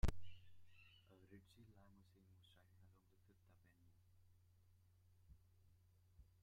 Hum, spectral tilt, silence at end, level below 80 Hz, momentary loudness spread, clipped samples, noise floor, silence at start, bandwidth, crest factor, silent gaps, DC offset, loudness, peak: none; -6 dB/octave; 4.75 s; -58 dBFS; 11 LU; under 0.1%; -74 dBFS; 0.05 s; 15 kHz; 24 dB; none; under 0.1%; -59 LUFS; -28 dBFS